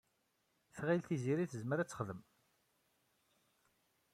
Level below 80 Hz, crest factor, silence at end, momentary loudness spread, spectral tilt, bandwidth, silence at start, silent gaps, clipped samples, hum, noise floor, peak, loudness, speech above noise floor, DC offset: -78 dBFS; 20 dB; 1.95 s; 12 LU; -7 dB/octave; 15 kHz; 0.75 s; none; under 0.1%; none; -81 dBFS; -24 dBFS; -39 LUFS; 42 dB; under 0.1%